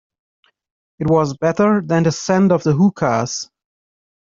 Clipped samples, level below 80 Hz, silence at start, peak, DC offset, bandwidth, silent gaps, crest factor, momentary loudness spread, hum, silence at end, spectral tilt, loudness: under 0.1%; -54 dBFS; 1 s; -2 dBFS; under 0.1%; 7.6 kHz; none; 16 dB; 10 LU; none; 0.85 s; -6.5 dB/octave; -17 LUFS